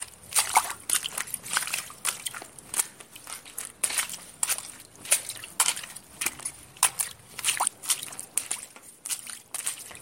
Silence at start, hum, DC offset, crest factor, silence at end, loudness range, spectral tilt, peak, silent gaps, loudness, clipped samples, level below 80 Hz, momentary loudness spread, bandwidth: 0 s; none; under 0.1%; 30 dB; 0 s; 3 LU; 1.5 dB/octave; -2 dBFS; none; -28 LUFS; under 0.1%; -66 dBFS; 13 LU; 17 kHz